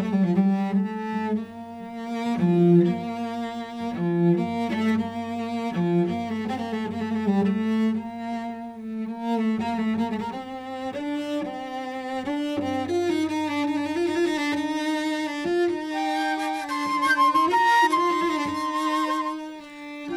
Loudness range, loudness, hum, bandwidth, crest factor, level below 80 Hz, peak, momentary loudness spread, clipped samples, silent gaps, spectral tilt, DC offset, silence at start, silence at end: 6 LU; -25 LUFS; none; 13 kHz; 16 dB; -66 dBFS; -8 dBFS; 12 LU; under 0.1%; none; -6.5 dB/octave; under 0.1%; 0 s; 0 s